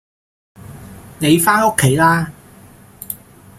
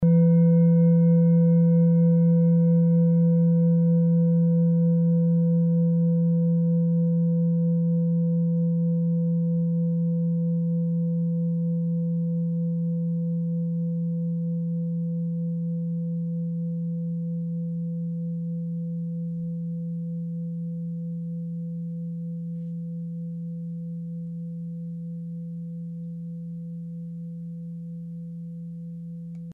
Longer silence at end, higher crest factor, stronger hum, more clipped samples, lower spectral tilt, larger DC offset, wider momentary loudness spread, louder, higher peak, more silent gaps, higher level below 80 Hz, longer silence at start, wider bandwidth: first, 0.45 s vs 0 s; first, 18 dB vs 12 dB; neither; neither; second, -4.5 dB/octave vs -14.5 dB/octave; neither; first, 24 LU vs 17 LU; first, -14 LUFS vs -24 LUFS; first, 0 dBFS vs -12 dBFS; neither; first, -48 dBFS vs -64 dBFS; first, 0.65 s vs 0 s; first, 16.5 kHz vs 1.6 kHz